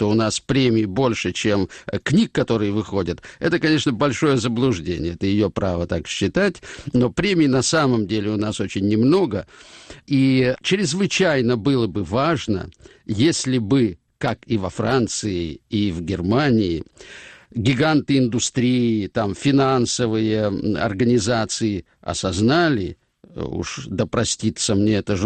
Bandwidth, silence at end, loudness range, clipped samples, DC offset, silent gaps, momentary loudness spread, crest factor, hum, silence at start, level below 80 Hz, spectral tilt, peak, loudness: 9.2 kHz; 0 s; 2 LU; under 0.1%; under 0.1%; none; 10 LU; 12 dB; none; 0 s; -46 dBFS; -5 dB/octave; -8 dBFS; -20 LUFS